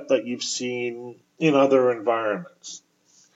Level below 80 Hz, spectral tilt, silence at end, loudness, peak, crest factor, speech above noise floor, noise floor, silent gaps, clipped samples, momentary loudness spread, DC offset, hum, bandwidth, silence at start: -86 dBFS; -4.5 dB/octave; 0.6 s; -23 LUFS; -6 dBFS; 18 dB; 37 dB; -60 dBFS; none; under 0.1%; 21 LU; under 0.1%; none; 8 kHz; 0 s